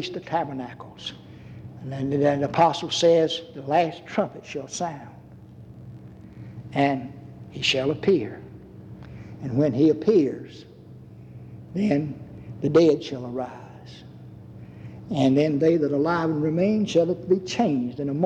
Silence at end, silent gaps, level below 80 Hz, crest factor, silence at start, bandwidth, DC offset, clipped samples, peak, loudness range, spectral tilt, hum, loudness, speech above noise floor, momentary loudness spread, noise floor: 0 s; none; -58 dBFS; 18 dB; 0 s; 9.6 kHz; under 0.1%; under 0.1%; -8 dBFS; 6 LU; -6 dB/octave; none; -23 LUFS; 22 dB; 23 LU; -45 dBFS